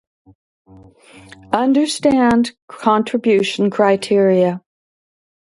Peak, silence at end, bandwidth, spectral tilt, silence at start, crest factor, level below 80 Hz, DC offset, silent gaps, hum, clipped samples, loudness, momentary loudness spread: 0 dBFS; 0.85 s; 11.5 kHz; -5.5 dB/octave; 1.5 s; 16 dB; -54 dBFS; under 0.1%; 2.62-2.68 s; none; under 0.1%; -16 LUFS; 7 LU